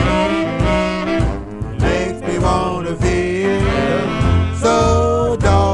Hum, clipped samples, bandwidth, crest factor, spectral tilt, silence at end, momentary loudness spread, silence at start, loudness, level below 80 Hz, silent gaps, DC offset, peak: none; under 0.1%; 11 kHz; 14 dB; -6.5 dB/octave; 0 s; 6 LU; 0 s; -17 LUFS; -26 dBFS; none; under 0.1%; -2 dBFS